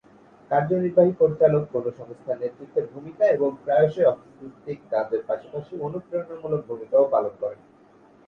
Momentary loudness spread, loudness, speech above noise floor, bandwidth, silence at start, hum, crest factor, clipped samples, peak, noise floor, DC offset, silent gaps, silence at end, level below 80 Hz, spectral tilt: 15 LU; -24 LUFS; 30 dB; 6.2 kHz; 0.5 s; none; 18 dB; under 0.1%; -4 dBFS; -54 dBFS; under 0.1%; none; 0.75 s; -64 dBFS; -9.5 dB/octave